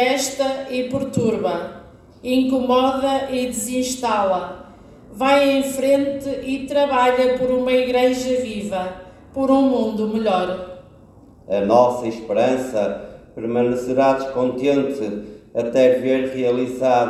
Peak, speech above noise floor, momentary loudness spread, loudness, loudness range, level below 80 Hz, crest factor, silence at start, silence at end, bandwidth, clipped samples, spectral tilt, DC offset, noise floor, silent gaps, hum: -2 dBFS; 28 dB; 11 LU; -19 LUFS; 2 LU; -52 dBFS; 18 dB; 0 s; 0 s; 14 kHz; under 0.1%; -4.5 dB/octave; under 0.1%; -46 dBFS; none; none